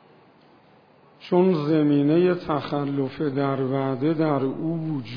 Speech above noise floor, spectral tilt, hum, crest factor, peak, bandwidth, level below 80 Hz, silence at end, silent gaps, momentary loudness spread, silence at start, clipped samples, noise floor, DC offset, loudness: 33 dB; -10 dB/octave; none; 16 dB; -8 dBFS; 5.2 kHz; -64 dBFS; 0 s; none; 7 LU; 1.2 s; under 0.1%; -55 dBFS; under 0.1%; -23 LUFS